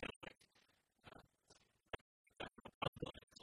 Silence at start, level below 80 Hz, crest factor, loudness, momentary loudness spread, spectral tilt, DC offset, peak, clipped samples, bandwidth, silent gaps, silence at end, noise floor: 0 s; -70 dBFS; 26 dB; -51 LUFS; 19 LU; -5 dB/octave; under 0.1%; -28 dBFS; under 0.1%; 12.5 kHz; 0.16-0.21 s, 2.01-2.24 s, 2.75-2.81 s, 2.88-2.93 s, 3.23-3.27 s; 0 s; -78 dBFS